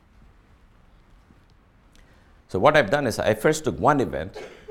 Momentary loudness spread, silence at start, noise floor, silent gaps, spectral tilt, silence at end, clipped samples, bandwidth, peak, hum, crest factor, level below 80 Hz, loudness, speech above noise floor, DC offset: 14 LU; 2.5 s; -56 dBFS; none; -5 dB/octave; 0.15 s; under 0.1%; 17 kHz; -4 dBFS; none; 22 dB; -50 dBFS; -22 LUFS; 34 dB; under 0.1%